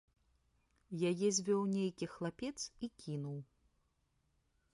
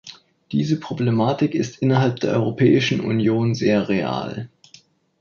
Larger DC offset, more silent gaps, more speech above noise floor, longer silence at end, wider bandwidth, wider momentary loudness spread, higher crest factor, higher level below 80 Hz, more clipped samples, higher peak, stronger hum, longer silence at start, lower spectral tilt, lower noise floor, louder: neither; neither; first, 41 dB vs 33 dB; first, 1.3 s vs 0.75 s; first, 11.5 kHz vs 7.2 kHz; first, 13 LU vs 10 LU; about the same, 20 dB vs 16 dB; second, -74 dBFS vs -56 dBFS; neither; second, -22 dBFS vs -4 dBFS; neither; first, 0.9 s vs 0.05 s; second, -5 dB/octave vs -7 dB/octave; first, -79 dBFS vs -52 dBFS; second, -39 LUFS vs -20 LUFS